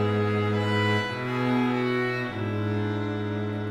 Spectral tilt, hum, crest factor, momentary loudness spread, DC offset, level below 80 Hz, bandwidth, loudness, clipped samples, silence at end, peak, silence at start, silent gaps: -7 dB/octave; none; 14 dB; 5 LU; under 0.1%; -58 dBFS; 11 kHz; -26 LUFS; under 0.1%; 0 s; -12 dBFS; 0 s; none